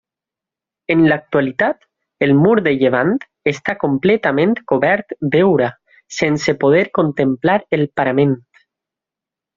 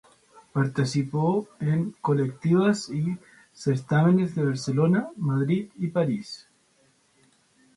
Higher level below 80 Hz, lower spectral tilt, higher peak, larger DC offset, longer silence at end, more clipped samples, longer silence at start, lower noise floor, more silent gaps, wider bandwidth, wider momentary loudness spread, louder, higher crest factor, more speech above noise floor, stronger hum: first, -54 dBFS vs -64 dBFS; second, -5.5 dB/octave vs -7.5 dB/octave; first, -2 dBFS vs -10 dBFS; neither; second, 1.2 s vs 1.4 s; neither; first, 0.9 s vs 0.35 s; first, -87 dBFS vs -64 dBFS; neither; second, 7.4 kHz vs 11.5 kHz; about the same, 7 LU vs 9 LU; first, -16 LUFS vs -25 LUFS; about the same, 16 dB vs 16 dB; first, 72 dB vs 40 dB; neither